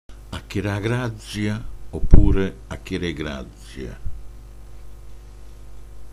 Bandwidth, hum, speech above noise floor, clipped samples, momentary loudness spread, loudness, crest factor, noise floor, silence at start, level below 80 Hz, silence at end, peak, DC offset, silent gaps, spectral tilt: 11 kHz; 50 Hz at -40 dBFS; 21 dB; under 0.1%; 26 LU; -25 LUFS; 20 dB; -38 dBFS; 0.1 s; -24 dBFS; 0 s; 0 dBFS; under 0.1%; none; -7 dB/octave